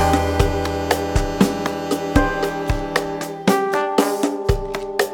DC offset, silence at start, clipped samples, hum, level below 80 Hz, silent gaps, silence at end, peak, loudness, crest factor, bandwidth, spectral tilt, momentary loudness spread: under 0.1%; 0 s; under 0.1%; none; -28 dBFS; none; 0 s; 0 dBFS; -20 LUFS; 18 dB; 19.5 kHz; -5.5 dB/octave; 5 LU